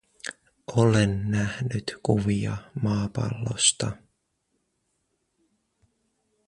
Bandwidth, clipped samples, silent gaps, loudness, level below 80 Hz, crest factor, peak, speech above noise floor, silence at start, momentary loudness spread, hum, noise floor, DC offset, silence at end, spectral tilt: 11 kHz; under 0.1%; none; -25 LUFS; -50 dBFS; 22 dB; -6 dBFS; 51 dB; 0.25 s; 17 LU; none; -75 dBFS; under 0.1%; 2.5 s; -4.5 dB/octave